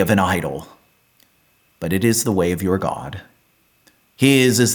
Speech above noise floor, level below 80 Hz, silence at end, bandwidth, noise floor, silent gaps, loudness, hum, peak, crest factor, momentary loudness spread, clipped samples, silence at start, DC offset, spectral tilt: 43 dB; -50 dBFS; 0 s; 19 kHz; -60 dBFS; none; -18 LUFS; none; -4 dBFS; 16 dB; 17 LU; under 0.1%; 0 s; under 0.1%; -4.5 dB/octave